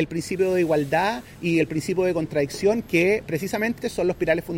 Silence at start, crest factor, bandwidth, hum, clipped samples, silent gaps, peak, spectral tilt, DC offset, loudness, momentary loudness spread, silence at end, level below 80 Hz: 0 s; 16 dB; 16.5 kHz; none; under 0.1%; none; -6 dBFS; -6 dB/octave; under 0.1%; -23 LUFS; 5 LU; 0 s; -50 dBFS